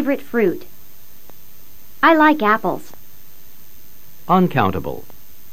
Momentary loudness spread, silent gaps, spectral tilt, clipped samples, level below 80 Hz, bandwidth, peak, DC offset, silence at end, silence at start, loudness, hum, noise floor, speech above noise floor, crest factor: 19 LU; none; -6.5 dB/octave; under 0.1%; -50 dBFS; 16 kHz; -2 dBFS; 4%; 0.5 s; 0 s; -17 LUFS; none; -47 dBFS; 30 dB; 20 dB